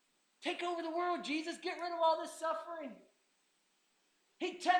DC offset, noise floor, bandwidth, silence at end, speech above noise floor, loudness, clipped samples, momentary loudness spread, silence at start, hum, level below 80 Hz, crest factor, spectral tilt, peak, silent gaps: under 0.1%; -77 dBFS; 19 kHz; 0 s; 40 dB; -38 LUFS; under 0.1%; 10 LU; 0.4 s; none; under -90 dBFS; 22 dB; -2 dB/octave; -16 dBFS; none